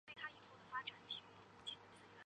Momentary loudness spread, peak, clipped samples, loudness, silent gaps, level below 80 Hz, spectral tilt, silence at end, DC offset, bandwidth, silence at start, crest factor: 13 LU; -32 dBFS; under 0.1%; -51 LUFS; none; -84 dBFS; -2.5 dB/octave; 0 s; under 0.1%; 9.6 kHz; 0.05 s; 22 dB